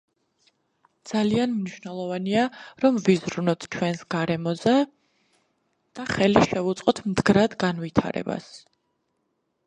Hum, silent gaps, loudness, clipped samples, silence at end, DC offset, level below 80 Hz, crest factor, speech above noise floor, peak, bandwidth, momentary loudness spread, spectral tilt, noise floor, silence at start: none; none; -24 LUFS; under 0.1%; 1.1 s; under 0.1%; -54 dBFS; 22 dB; 51 dB; -4 dBFS; 10.5 kHz; 11 LU; -6 dB/octave; -74 dBFS; 1.05 s